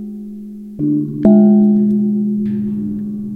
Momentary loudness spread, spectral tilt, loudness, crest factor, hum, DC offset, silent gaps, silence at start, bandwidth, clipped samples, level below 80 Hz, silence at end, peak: 20 LU; -12.5 dB/octave; -14 LUFS; 14 dB; none; under 0.1%; none; 0 s; 1.9 kHz; under 0.1%; -46 dBFS; 0 s; 0 dBFS